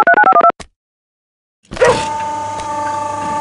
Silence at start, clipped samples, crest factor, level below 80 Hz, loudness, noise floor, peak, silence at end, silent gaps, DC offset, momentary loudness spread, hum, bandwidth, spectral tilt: 0 s; under 0.1%; 14 dB; -44 dBFS; -14 LUFS; under -90 dBFS; 0 dBFS; 0 s; 0.76-1.63 s; under 0.1%; 13 LU; none; 11.5 kHz; -3.5 dB/octave